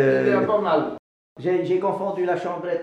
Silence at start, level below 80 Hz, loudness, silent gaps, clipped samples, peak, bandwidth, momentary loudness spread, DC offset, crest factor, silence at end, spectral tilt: 0 s; -66 dBFS; -23 LUFS; 0.99-1.36 s; under 0.1%; -8 dBFS; 8.2 kHz; 9 LU; under 0.1%; 14 dB; 0 s; -7.5 dB/octave